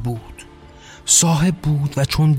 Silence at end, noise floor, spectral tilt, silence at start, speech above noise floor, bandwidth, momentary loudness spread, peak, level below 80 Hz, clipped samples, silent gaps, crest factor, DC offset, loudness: 0 s; -42 dBFS; -4 dB/octave; 0 s; 25 dB; 16.5 kHz; 17 LU; -2 dBFS; -38 dBFS; under 0.1%; none; 16 dB; under 0.1%; -16 LUFS